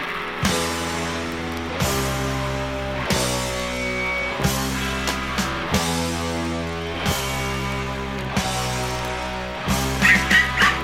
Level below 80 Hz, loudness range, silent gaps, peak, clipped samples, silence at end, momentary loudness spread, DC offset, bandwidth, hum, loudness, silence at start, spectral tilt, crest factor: -34 dBFS; 4 LU; none; -4 dBFS; under 0.1%; 0 s; 10 LU; under 0.1%; 16.5 kHz; none; -22 LUFS; 0 s; -3.5 dB/octave; 20 dB